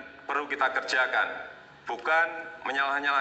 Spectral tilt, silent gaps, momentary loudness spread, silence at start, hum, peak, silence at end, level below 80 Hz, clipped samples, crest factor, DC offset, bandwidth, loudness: -1.5 dB/octave; none; 13 LU; 0 s; none; -12 dBFS; 0 s; -72 dBFS; under 0.1%; 16 dB; under 0.1%; 8.8 kHz; -28 LUFS